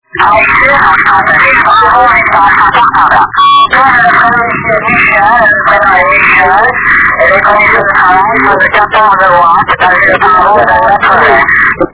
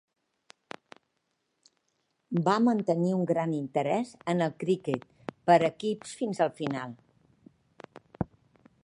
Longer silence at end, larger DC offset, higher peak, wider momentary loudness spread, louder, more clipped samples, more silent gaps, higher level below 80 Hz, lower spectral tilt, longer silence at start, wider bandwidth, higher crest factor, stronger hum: second, 0.05 s vs 0.6 s; neither; first, 0 dBFS vs -8 dBFS; second, 2 LU vs 16 LU; first, -4 LUFS vs -29 LUFS; first, 7% vs under 0.1%; neither; first, -32 dBFS vs -66 dBFS; about the same, -7 dB/octave vs -7 dB/octave; second, 0.15 s vs 2.3 s; second, 4 kHz vs 11 kHz; second, 6 dB vs 22 dB; neither